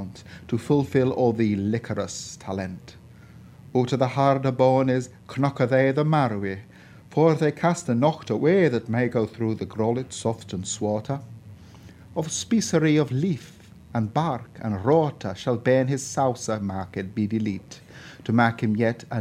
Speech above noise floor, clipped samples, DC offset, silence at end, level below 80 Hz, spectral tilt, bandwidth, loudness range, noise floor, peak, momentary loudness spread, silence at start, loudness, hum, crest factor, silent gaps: 23 dB; under 0.1%; under 0.1%; 0 s; -60 dBFS; -6 dB/octave; 13.5 kHz; 4 LU; -47 dBFS; -4 dBFS; 12 LU; 0 s; -24 LUFS; none; 20 dB; none